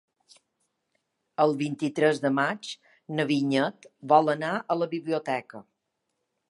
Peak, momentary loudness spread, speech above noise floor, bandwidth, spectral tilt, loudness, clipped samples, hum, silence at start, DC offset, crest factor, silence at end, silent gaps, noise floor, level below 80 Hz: -6 dBFS; 16 LU; 54 dB; 11.5 kHz; -6 dB/octave; -26 LUFS; under 0.1%; none; 1.4 s; under 0.1%; 22 dB; 0.9 s; none; -80 dBFS; -80 dBFS